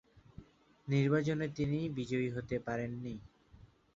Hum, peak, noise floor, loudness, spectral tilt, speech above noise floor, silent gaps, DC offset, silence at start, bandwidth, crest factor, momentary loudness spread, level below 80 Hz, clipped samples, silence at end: none; -18 dBFS; -61 dBFS; -36 LUFS; -7 dB/octave; 27 dB; none; under 0.1%; 0.15 s; 7.6 kHz; 18 dB; 14 LU; -62 dBFS; under 0.1%; 0.3 s